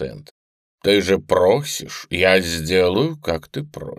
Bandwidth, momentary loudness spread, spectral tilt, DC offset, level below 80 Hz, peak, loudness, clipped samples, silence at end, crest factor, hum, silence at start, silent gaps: 15.5 kHz; 12 LU; -4.5 dB/octave; under 0.1%; -46 dBFS; 0 dBFS; -18 LUFS; under 0.1%; 0.05 s; 20 dB; none; 0 s; 0.31-0.78 s